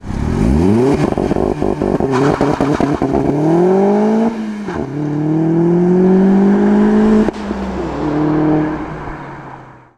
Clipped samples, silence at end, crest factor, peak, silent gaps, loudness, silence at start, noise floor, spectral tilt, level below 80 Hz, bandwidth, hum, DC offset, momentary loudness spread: under 0.1%; 0.25 s; 14 dB; 0 dBFS; none; -14 LUFS; 0.05 s; -35 dBFS; -8.5 dB/octave; -30 dBFS; 10.5 kHz; none; 0.2%; 11 LU